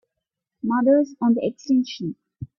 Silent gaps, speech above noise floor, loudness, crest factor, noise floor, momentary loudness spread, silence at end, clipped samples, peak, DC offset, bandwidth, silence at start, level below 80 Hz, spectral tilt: none; 62 dB; -22 LUFS; 16 dB; -83 dBFS; 14 LU; 0.15 s; under 0.1%; -6 dBFS; under 0.1%; 7 kHz; 0.65 s; -62 dBFS; -7 dB/octave